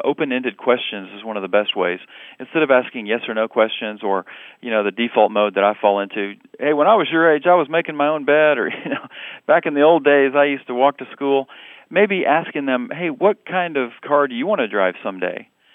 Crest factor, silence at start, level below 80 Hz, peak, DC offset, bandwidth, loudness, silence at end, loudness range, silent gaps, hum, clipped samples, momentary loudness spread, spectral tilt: 18 dB; 0 s; -86 dBFS; 0 dBFS; under 0.1%; 3.9 kHz; -18 LUFS; 0.35 s; 4 LU; none; none; under 0.1%; 12 LU; -8 dB/octave